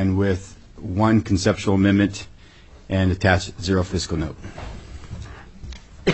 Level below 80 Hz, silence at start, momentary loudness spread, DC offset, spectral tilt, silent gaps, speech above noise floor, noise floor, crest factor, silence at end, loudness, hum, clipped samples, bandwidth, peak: -40 dBFS; 0 s; 22 LU; under 0.1%; -6 dB/octave; none; 26 dB; -46 dBFS; 20 dB; 0 s; -21 LUFS; none; under 0.1%; 8.4 kHz; -2 dBFS